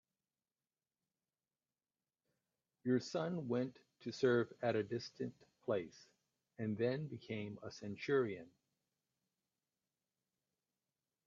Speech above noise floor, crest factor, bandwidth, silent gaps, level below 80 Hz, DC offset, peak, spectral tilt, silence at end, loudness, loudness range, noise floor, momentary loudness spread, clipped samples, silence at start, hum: over 50 dB; 22 dB; 7.6 kHz; none; -84 dBFS; under 0.1%; -22 dBFS; -6.5 dB/octave; 2.8 s; -41 LUFS; 6 LU; under -90 dBFS; 13 LU; under 0.1%; 2.85 s; none